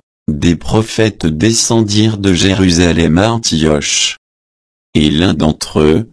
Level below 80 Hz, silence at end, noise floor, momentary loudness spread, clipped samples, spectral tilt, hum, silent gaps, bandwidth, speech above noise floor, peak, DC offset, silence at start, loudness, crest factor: -30 dBFS; 0.05 s; under -90 dBFS; 5 LU; under 0.1%; -4.5 dB/octave; none; 4.18-4.93 s; 11 kHz; over 79 dB; 0 dBFS; under 0.1%; 0.3 s; -12 LUFS; 12 dB